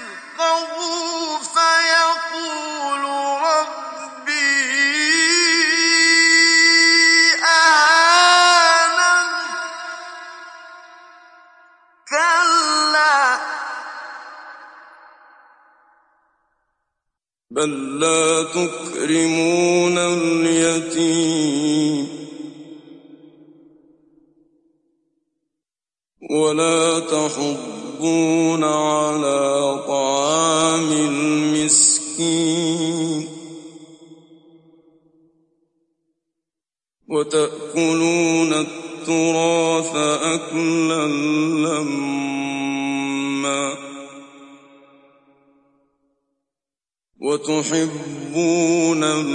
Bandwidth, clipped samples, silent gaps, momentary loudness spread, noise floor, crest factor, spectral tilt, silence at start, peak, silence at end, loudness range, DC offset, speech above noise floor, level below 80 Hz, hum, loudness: 11 kHz; under 0.1%; none; 17 LU; under -90 dBFS; 18 dB; -2.5 dB/octave; 0 s; -2 dBFS; 0 s; 15 LU; under 0.1%; over 72 dB; -70 dBFS; none; -17 LUFS